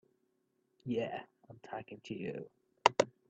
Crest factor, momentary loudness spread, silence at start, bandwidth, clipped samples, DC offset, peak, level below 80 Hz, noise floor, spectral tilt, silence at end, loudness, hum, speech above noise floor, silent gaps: 32 dB; 23 LU; 0.85 s; 8.4 kHz; under 0.1%; under 0.1%; -6 dBFS; -78 dBFS; -79 dBFS; -4 dB/octave; 0.2 s; -37 LUFS; none; 38 dB; none